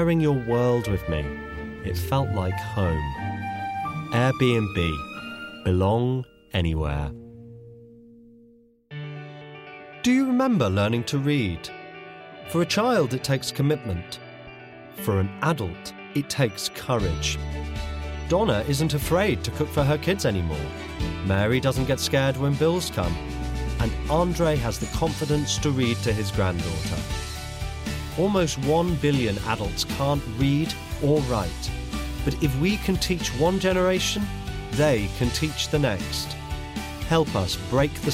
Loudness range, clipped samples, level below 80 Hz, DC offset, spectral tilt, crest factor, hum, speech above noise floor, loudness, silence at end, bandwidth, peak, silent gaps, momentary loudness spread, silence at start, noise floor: 4 LU; under 0.1%; -36 dBFS; under 0.1%; -5.5 dB/octave; 16 dB; none; 32 dB; -25 LUFS; 0 s; 16 kHz; -8 dBFS; none; 11 LU; 0 s; -55 dBFS